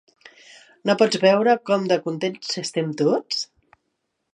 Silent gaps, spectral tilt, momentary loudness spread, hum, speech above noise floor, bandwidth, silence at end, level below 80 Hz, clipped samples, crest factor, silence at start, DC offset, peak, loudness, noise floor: none; -4.5 dB/octave; 10 LU; none; 55 dB; 11 kHz; 0.9 s; -74 dBFS; under 0.1%; 20 dB; 0.85 s; under 0.1%; -4 dBFS; -21 LUFS; -76 dBFS